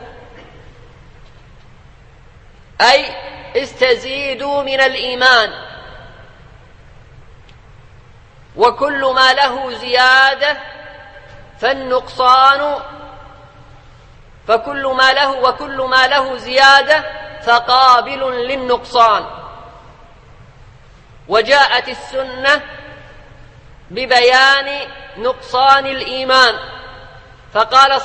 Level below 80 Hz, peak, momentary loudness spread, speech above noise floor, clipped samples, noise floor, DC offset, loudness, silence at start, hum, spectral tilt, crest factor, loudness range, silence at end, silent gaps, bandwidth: -44 dBFS; 0 dBFS; 19 LU; 29 dB; under 0.1%; -42 dBFS; under 0.1%; -13 LUFS; 0 s; none; -2 dB/octave; 16 dB; 6 LU; 0 s; none; 11 kHz